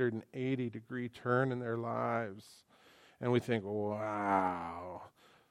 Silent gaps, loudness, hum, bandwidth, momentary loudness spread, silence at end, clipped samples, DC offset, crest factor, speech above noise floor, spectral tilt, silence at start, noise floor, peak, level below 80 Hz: none; -36 LUFS; none; 14.5 kHz; 12 LU; 0.4 s; under 0.1%; under 0.1%; 20 dB; 28 dB; -7.5 dB/octave; 0 s; -63 dBFS; -16 dBFS; -78 dBFS